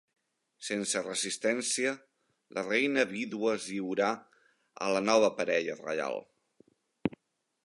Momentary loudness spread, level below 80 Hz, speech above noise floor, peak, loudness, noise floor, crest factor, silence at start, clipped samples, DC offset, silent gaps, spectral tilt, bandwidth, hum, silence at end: 11 LU; -72 dBFS; 48 dB; -12 dBFS; -31 LUFS; -79 dBFS; 22 dB; 0.6 s; under 0.1%; under 0.1%; none; -3 dB/octave; 11.5 kHz; none; 0.55 s